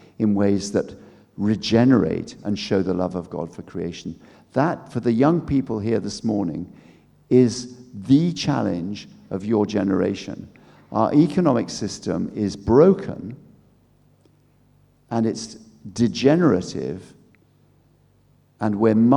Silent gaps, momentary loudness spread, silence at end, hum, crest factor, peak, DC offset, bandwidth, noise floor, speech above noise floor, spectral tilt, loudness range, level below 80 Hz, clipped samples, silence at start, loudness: none; 16 LU; 0 s; none; 20 dB; -2 dBFS; under 0.1%; 11 kHz; -58 dBFS; 38 dB; -7 dB/octave; 3 LU; -52 dBFS; under 0.1%; 0.2 s; -21 LUFS